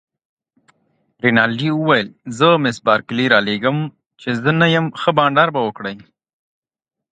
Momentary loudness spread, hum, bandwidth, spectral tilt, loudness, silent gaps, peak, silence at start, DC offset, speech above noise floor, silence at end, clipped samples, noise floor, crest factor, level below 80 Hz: 14 LU; none; 9.2 kHz; -6 dB/octave; -16 LUFS; 4.06-4.10 s; 0 dBFS; 1.25 s; under 0.1%; 69 dB; 1.15 s; under 0.1%; -85 dBFS; 18 dB; -60 dBFS